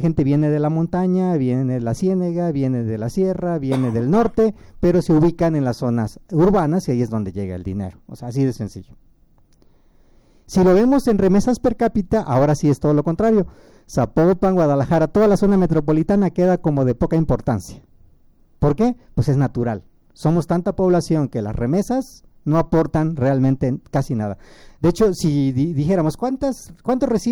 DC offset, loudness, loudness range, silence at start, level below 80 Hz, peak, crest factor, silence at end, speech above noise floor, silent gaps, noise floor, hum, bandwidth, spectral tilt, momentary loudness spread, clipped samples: under 0.1%; -19 LUFS; 5 LU; 0 s; -38 dBFS; -6 dBFS; 12 dB; 0 s; 35 dB; none; -53 dBFS; none; over 20 kHz; -8 dB/octave; 9 LU; under 0.1%